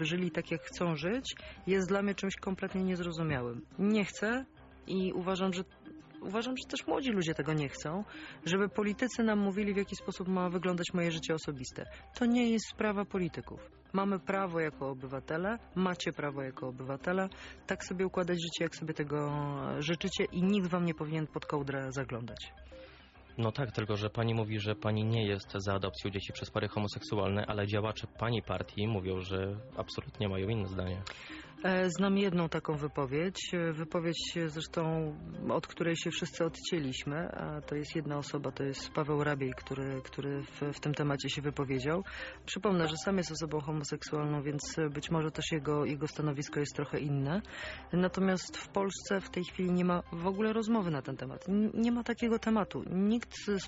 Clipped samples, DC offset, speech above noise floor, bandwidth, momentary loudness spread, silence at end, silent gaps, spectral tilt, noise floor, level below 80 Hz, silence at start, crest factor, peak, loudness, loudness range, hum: under 0.1%; under 0.1%; 22 dB; 8 kHz; 9 LU; 0 s; none; -5 dB/octave; -56 dBFS; -58 dBFS; 0 s; 16 dB; -18 dBFS; -35 LUFS; 3 LU; none